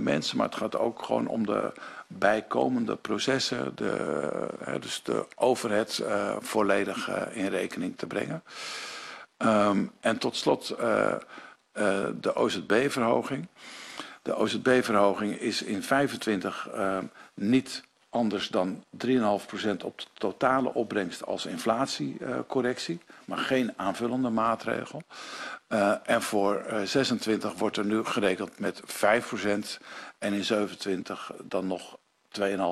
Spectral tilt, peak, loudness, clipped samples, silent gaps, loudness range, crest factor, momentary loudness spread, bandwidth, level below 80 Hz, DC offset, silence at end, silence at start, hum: -4.5 dB/octave; -8 dBFS; -29 LUFS; under 0.1%; none; 3 LU; 20 dB; 12 LU; 13.5 kHz; -68 dBFS; under 0.1%; 0 s; 0 s; none